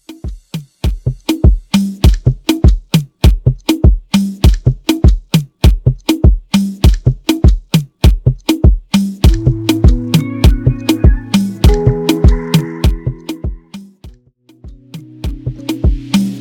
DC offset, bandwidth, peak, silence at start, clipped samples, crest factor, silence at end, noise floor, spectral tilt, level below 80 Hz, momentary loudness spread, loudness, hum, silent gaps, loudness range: under 0.1%; 18.5 kHz; 0 dBFS; 0.1 s; under 0.1%; 12 dB; 0 s; -48 dBFS; -6.5 dB/octave; -14 dBFS; 12 LU; -13 LUFS; none; none; 5 LU